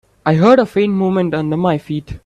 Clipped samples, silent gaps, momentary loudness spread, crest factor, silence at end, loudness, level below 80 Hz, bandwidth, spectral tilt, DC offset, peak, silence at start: under 0.1%; none; 8 LU; 14 dB; 0.1 s; -14 LUFS; -44 dBFS; 9.8 kHz; -8 dB/octave; under 0.1%; 0 dBFS; 0.25 s